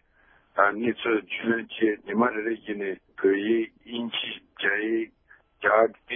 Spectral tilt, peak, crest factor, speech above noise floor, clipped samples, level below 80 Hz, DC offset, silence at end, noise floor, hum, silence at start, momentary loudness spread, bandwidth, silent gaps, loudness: -9 dB/octave; -6 dBFS; 22 dB; 35 dB; under 0.1%; -70 dBFS; under 0.1%; 0 s; -61 dBFS; none; 0.55 s; 10 LU; 3.8 kHz; none; -26 LUFS